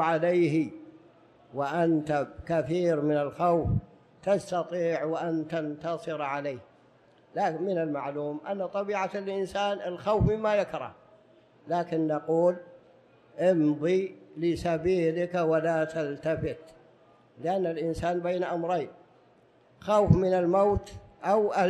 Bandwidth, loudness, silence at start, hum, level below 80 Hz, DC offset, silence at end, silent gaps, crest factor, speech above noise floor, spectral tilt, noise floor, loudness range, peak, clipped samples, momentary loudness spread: 11.5 kHz; -28 LUFS; 0 s; none; -50 dBFS; under 0.1%; 0 s; none; 22 dB; 33 dB; -7.5 dB/octave; -61 dBFS; 5 LU; -8 dBFS; under 0.1%; 11 LU